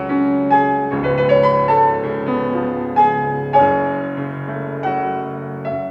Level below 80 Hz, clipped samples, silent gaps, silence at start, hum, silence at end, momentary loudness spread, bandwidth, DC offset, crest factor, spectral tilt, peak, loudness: -50 dBFS; under 0.1%; none; 0 s; none; 0 s; 11 LU; 6.2 kHz; under 0.1%; 16 dB; -9 dB/octave; -2 dBFS; -17 LUFS